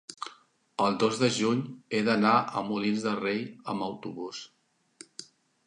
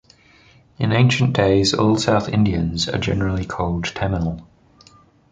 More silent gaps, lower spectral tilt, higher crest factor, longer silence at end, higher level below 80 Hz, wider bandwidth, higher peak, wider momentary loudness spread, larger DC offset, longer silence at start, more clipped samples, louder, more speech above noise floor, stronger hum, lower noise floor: neither; about the same, -5 dB/octave vs -5.5 dB/octave; about the same, 20 dB vs 18 dB; second, 0.45 s vs 0.9 s; second, -74 dBFS vs -38 dBFS; first, 11 kHz vs 9.4 kHz; second, -10 dBFS vs -2 dBFS; first, 19 LU vs 8 LU; neither; second, 0.1 s vs 0.8 s; neither; second, -28 LUFS vs -19 LUFS; about the same, 30 dB vs 33 dB; neither; first, -59 dBFS vs -51 dBFS